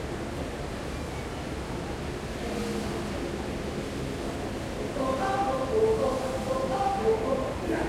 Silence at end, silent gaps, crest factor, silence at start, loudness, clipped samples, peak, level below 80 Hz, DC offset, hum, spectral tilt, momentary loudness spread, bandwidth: 0 s; none; 16 dB; 0 s; -30 LUFS; under 0.1%; -14 dBFS; -42 dBFS; under 0.1%; none; -5.5 dB/octave; 9 LU; 16 kHz